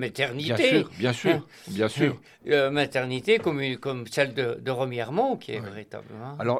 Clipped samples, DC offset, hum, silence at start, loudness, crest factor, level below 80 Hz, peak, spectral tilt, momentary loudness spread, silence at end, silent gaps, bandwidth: under 0.1%; under 0.1%; none; 0 s; -26 LUFS; 18 dB; -68 dBFS; -8 dBFS; -5.5 dB/octave; 14 LU; 0 s; none; 15 kHz